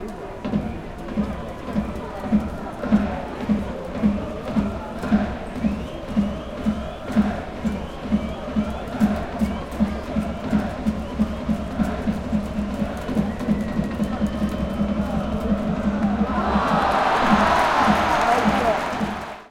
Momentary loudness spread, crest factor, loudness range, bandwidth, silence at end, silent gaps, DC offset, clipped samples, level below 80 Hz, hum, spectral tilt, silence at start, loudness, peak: 10 LU; 18 dB; 6 LU; 14 kHz; 0 s; none; under 0.1%; under 0.1%; -36 dBFS; none; -6.5 dB/octave; 0 s; -23 LUFS; -4 dBFS